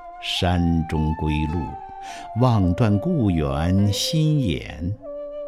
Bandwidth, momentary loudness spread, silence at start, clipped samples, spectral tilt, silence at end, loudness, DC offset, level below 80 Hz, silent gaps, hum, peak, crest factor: 15.5 kHz; 13 LU; 0 s; under 0.1%; -6.5 dB/octave; 0 s; -22 LUFS; under 0.1%; -36 dBFS; none; none; -6 dBFS; 16 dB